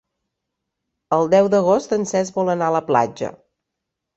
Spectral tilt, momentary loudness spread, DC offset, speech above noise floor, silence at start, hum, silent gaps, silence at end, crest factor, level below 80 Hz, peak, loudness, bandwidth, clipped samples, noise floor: -6 dB/octave; 8 LU; under 0.1%; 63 dB; 1.1 s; none; none; 0.85 s; 18 dB; -62 dBFS; -2 dBFS; -18 LUFS; 8.2 kHz; under 0.1%; -81 dBFS